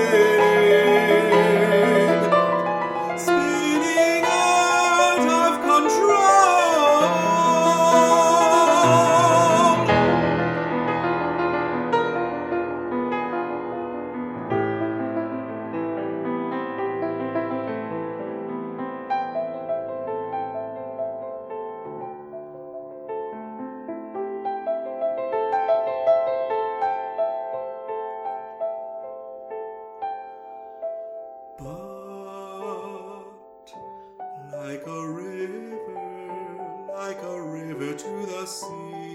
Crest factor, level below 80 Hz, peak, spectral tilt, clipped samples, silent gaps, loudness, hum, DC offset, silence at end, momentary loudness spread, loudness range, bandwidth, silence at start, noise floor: 18 dB; -60 dBFS; -4 dBFS; -4.5 dB/octave; under 0.1%; none; -21 LUFS; none; under 0.1%; 0 s; 20 LU; 19 LU; 16.5 kHz; 0 s; -46 dBFS